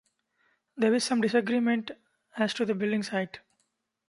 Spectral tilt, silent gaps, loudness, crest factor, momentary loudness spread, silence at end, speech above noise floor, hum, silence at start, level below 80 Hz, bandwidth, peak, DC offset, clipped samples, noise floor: -4.5 dB/octave; none; -28 LUFS; 18 dB; 18 LU; 0.7 s; 50 dB; none; 0.75 s; -76 dBFS; 11.5 kHz; -12 dBFS; under 0.1%; under 0.1%; -77 dBFS